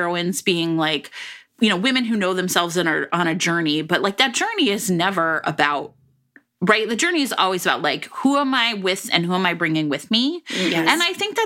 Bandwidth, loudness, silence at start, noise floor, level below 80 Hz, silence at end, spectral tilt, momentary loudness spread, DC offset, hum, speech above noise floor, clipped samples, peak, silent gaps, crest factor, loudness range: 17 kHz; -19 LUFS; 0 s; -56 dBFS; -66 dBFS; 0 s; -3.5 dB/octave; 5 LU; under 0.1%; none; 35 dB; under 0.1%; 0 dBFS; none; 20 dB; 1 LU